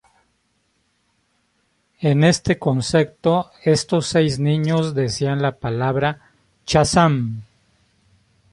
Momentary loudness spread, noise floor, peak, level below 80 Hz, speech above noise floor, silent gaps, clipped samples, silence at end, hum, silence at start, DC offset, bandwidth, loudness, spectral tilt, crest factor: 8 LU; -66 dBFS; -2 dBFS; -46 dBFS; 48 dB; none; under 0.1%; 1.1 s; none; 2 s; under 0.1%; 11.5 kHz; -19 LUFS; -5.5 dB/octave; 18 dB